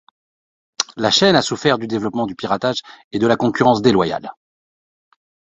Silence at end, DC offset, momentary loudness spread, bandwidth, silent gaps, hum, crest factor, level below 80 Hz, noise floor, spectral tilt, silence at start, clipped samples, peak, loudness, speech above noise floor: 1.25 s; under 0.1%; 12 LU; 8.4 kHz; 3.04-3.11 s; none; 18 dB; -54 dBFS; under -90 dBFS; -4.5 dB/octave; 0.8 s; under 0.1%; 0 dBFS; -17 LUFS; over 73 dB